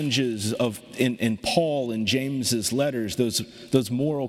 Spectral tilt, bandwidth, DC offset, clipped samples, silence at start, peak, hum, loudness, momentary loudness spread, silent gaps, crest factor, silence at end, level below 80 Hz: -4.5 dB/octave; 16.5 kHz; under 0.1%; under 0.1%; 0 s; -6 dBFS; none; -25 LUFS; 3 LU; none; 20 dB; 0 s; -58 dBFS